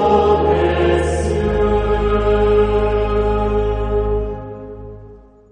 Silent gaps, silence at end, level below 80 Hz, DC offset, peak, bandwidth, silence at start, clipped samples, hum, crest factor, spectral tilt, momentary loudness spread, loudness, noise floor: none; 0.35 s; -24 dBFS; under 0.1%; -2 dBFS; 10 kHz; 0 s; under 0.1%; none; 14 dB; -7 dB/octave; 16 LU; -17 LUFS; -41 dBFS